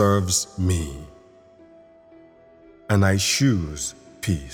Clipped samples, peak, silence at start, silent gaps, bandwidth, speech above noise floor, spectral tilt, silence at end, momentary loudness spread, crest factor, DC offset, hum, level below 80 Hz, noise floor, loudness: under 0.1%; -6 dBFS; 0 s; none; 18 kHz; 29 dB; -4.5 dB/octave; 0 s; 12 LU; 18 dB; under 0.1%; none; -42 dBFS; -50 dBFS; -22 LUFS